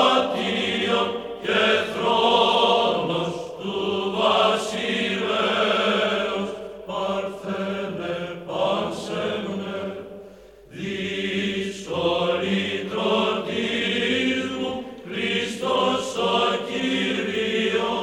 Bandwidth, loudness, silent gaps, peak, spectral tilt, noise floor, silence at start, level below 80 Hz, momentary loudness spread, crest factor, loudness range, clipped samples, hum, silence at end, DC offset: 15.5 kHz; -23 LUFS; none; -4 dBFS; -4.5 dB/octave; -46 dBFS; 0 s; -58 dBFS; 11 LU; 18 dB; 7 LU; under 0.1%; none; 0 s; under 0.1%